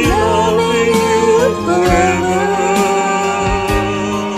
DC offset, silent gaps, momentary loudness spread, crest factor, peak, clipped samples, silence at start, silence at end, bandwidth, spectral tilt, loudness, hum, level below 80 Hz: under 0.1%; none; 4 LU; 14 dB; 0 dBFS; under 0.1%; 0 s; 0 s; 15.5 kHz; -5 dB/octave; -13 LUFS; none; -30 dBFS